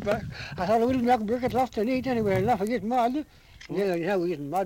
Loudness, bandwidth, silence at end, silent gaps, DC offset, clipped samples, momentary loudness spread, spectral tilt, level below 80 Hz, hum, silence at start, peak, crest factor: -26 LUFS; 17 kHz; 0 s; none; under 0.1%; under 0.1%; 8 LU; -7 dB/octave; -52 dBFS; none; 0 s; -10 dBFS; 16 dB